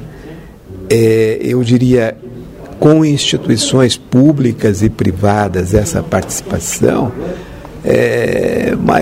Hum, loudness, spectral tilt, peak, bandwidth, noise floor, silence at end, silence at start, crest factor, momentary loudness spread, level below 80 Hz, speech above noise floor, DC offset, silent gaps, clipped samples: none; -12 LUFS; -5.5 dB/octave; 0 dBFS; 16.5 kHz; -32 dBFS; 0 s; 0 s; 12 dB; 20 LU; -34 dBFS; 20 dB; under 0.1%; none; under 0.1%